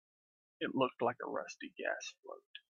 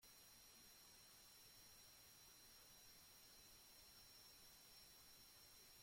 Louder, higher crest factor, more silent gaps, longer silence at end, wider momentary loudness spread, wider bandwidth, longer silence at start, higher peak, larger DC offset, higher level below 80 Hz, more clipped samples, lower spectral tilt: first, -39 LUFS vs -64 LUFS; first, 22 dB vs 14 dB; first, 2.19-2.23 s, 2.46-2.54 s vs none; first, 0.15 s vs 0 s; first, 17 LU vs 1 LU; second, 7.6 kHz vs 16.5 kHz; first, 0.6 s vs 0 s; first, -18 dBFS vs -54 dBFS; neither; about the same, -86 dBFS vs -82 dBFS; neither; first, -4 dB/octave vs -1 dB/octave